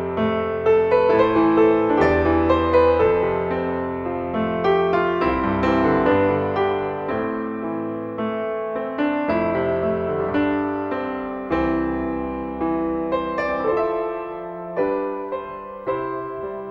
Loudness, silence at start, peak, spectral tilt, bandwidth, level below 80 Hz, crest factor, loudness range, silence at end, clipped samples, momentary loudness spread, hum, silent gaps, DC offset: -21 LUFS; 0 s; -4 dBFS; -8.5 dB/octave; 6.8 kHz; -42 dBFS; 16 dB; 6 LU; 0 s; under 0.1%; 11 LU; none; none; under 0.1%